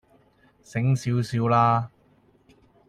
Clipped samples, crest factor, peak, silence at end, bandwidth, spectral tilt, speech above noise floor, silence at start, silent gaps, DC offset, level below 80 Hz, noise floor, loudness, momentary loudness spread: under 0.1%; 18 dB; -8 dBFS; 1 s; 10.5 kHz; -7.5 dB/octave; 38 dB; 0.75 s; none; under 0.1%; -60 dBFS; -60 dBFS; -23 LUFS; 11 LU